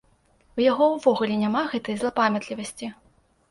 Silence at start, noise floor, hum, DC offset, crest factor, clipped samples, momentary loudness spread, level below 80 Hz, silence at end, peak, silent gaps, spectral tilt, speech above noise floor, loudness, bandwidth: 0.55 s; -61 dBFS; none; under 0.1%; 18 dB; under 0.1%; 15 LU; -62 dBFS; 0.6 s; -6 dBFS; none; -5 dB/octave; 38 dB; -24 LUFS; 11.5 kHz